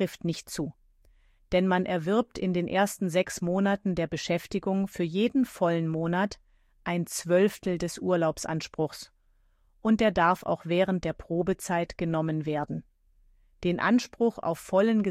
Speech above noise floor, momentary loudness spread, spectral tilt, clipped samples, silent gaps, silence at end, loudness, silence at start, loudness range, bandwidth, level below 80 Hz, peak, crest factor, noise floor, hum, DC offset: 38 dB; 9 LU; -6 dB/octave; under 0.1%; none; 0 s; -28 LUFS; 0 s; 2 LU; 15.5 kHz; -56 dBFS; -10 dBFS; 18 dB; -65 dBFS; none; under 0.1%